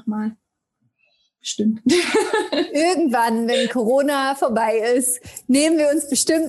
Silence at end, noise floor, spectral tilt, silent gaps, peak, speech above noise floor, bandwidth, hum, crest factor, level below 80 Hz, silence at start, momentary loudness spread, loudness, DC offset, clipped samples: 0 s; -70 dBFS; -3 dB/octave; none; -4 dBFS; 52 dB; 13 kHz; none; 14 dB; -62 dBFS; 0.05 s; 8 LU; -19 LUFS; under 0.1%; under 0.1%